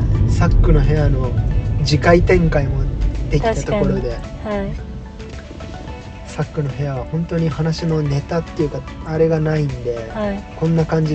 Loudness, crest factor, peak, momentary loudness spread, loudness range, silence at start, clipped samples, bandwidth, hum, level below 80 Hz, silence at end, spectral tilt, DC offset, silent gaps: -18 LUFS; 16 dB; 0 dBFS; 17 LU; 8 LU; 0 s; under 0.1%; 8.4 kHz; none; -24 dBFS; 0 s; -7.5 dB/octave; under 0.1%; none